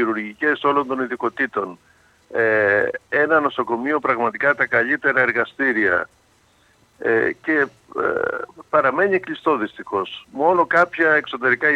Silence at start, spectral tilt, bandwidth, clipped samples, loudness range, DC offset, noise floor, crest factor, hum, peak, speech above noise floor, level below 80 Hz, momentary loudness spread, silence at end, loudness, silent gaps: 0 s; -6.5 dB/octave; 9.2 kHz; under 0.1%; 3 LU; under 0.1%; -58 dBFS; 16 dB; none; -4 dBFS; 38 dB; -64 dBFS; 9 LU; 0 s; -19 LUFS; none